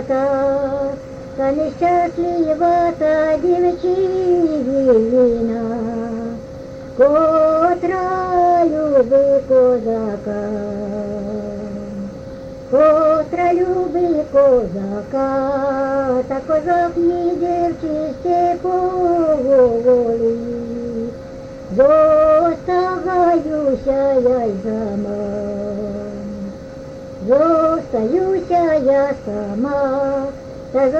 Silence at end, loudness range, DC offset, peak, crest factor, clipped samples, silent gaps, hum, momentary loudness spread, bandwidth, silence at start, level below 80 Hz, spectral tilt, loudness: 0 s; 4 LU; under 0.1%; -2 dBFS; 14 dB; under 0.1%; none; none; 14 LU; 8 kHz; 0 s; -42 dBFS; -8 dB/octave; -17 LUFS